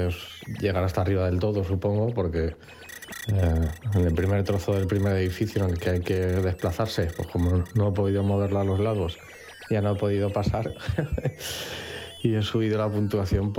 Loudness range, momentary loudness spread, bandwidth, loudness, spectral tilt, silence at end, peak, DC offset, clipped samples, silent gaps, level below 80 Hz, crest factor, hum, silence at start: 2 LU; 8 LU; 16.5 kHz; -26 LUFS; -7 dB/octave; 0 s; -8 dBFS; under 0.1%; under 0.1%; none; -40 dBFS; 16 dB; none; 0 s